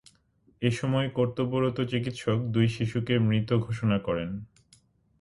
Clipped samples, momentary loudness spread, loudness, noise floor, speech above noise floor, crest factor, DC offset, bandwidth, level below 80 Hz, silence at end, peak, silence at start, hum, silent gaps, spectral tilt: under 0.1%; 6 LU; -28 LUFS; -65 dBFS; 38 dB; 18 dB; under 0.1%; 11.5 kHz; -56 dBFS; 0.75 s; -10 dBFS; 0.6 s; none; none; -7.5 dB/octave